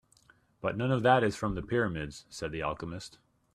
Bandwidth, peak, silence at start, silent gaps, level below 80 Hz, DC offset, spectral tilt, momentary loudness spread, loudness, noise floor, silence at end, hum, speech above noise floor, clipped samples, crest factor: 13 kHz; -10 dBFS; 0.65 s; none; -54 dBFS; under 0.1%; -6 dB/octave; 16 LU; -31 LUFS; -64 dBFS; 0.45 s; none; 34 dB; under 0.1%; 22 dB